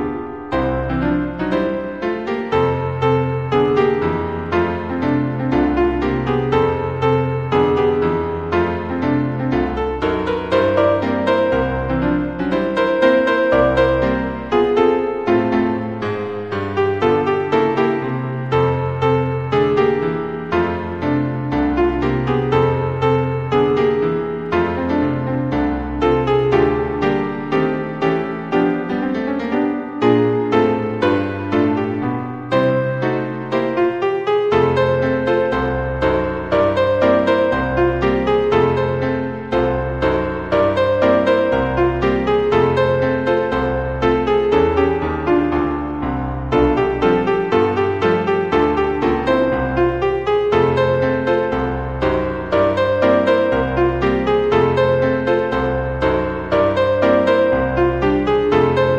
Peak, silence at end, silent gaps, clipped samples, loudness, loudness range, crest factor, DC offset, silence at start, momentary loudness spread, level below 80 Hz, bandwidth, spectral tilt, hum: 0 dBFS; 0 s; none; under 0.1%; -17 LUFS; 2 LU; 16 dB; 0.4%; 0 s; 6 LU; -34 dBFS; 8 kHz; -8 dB/octave; none